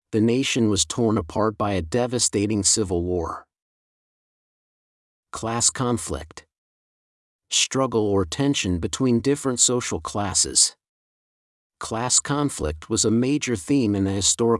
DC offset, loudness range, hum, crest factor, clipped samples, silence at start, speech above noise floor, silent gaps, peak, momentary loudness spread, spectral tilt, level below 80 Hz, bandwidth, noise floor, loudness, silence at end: under 0.1%; 7 LU; none; 20 dB; under 0.1%; 0.1 s; over 68 dB; 3.62-5.23 s, 6.58-7.39 s, 10.89-11.70 s; -4 dBFS; 9 LU; -3.5 dB/octave; -48 dBFS; 12 kHz; under -90 dBFS; -21 LUFS; 0 s